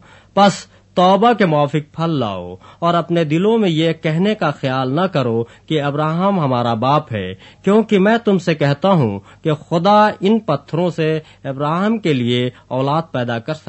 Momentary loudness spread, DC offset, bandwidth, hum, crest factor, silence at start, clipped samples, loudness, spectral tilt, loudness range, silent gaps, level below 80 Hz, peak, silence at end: 9 LU; under 0.1%; 8.4 kHz; none; 16 dB; 0.35 s; under 0.1%; -17 LUFS; -7 dB/octave; 2 LU; none; -56 dBFS; -2 dBFS; 0.1 s